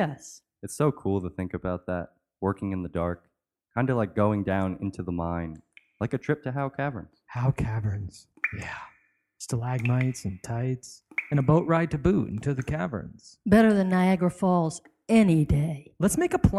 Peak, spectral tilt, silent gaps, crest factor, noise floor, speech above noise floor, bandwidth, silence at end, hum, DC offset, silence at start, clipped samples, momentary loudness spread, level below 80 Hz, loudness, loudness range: -6 dBFS; -7 dB/octave; none; 20 dB; -65 dBFS; 39 dB; 14 kHz; 0 s; none; under 0.1%; 0 s; under 0.1%; 15 LU; -46 dBFS; -27 LUFS; 7 LU